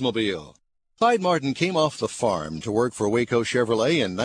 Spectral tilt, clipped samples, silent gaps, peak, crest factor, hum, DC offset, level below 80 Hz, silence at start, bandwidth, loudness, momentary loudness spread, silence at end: -5 dB/octave; under 0.1%; none; -8 dBFS; 16 dB; none; under 0.1%; -58 dBFS; 0 s; 10.5 kHz; -23 LUFS; 5 LU; 0 s